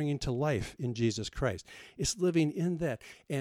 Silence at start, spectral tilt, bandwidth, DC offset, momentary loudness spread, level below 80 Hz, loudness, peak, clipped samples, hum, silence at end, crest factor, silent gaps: 0 s; -5.5 dB/octave; 15.5 kHz; under 0.1%; 9 LU; -50 dBFS; -32 LUFS; -18 dBFS; under 0.1%; none; 0 s; 14 dB; none